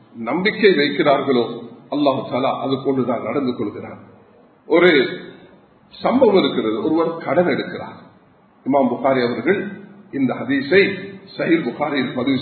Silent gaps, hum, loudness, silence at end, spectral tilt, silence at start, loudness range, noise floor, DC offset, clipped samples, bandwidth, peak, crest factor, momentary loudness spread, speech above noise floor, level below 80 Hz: none; none; -18 LUFS; 0 s; -9.5 dB/octave; 0.15 s; 3 LU; -52 dBFS; under 0.1%; under 0.1%; 4.6 kHz; 0 dBFS; 20 dB; 16 LU; 34 dB; -62 dBFS